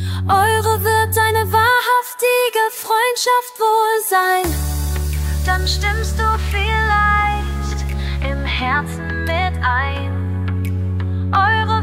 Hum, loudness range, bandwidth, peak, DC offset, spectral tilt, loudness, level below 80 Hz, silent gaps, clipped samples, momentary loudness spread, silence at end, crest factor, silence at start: none; 5 LU; 16.5 kHz; -2 dBFS; under 0.1%; -4.5 dB/octave; -17 LUFS; -26 dBFS; none; under 0.1%; 8 LU; 0 s; 14 dB; 0 s